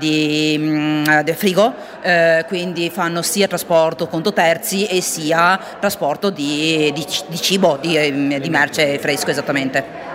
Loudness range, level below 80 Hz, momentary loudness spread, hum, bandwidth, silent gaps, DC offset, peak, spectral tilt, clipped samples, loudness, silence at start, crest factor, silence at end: 1 LU; -60 dBFS; 6 LU; none; 16.5 kHz; none; under 0.1%; 0 dBFS; -4 dB/octave; under 0.1%; -17 LUFS; 0 s; 16 dB; 0 s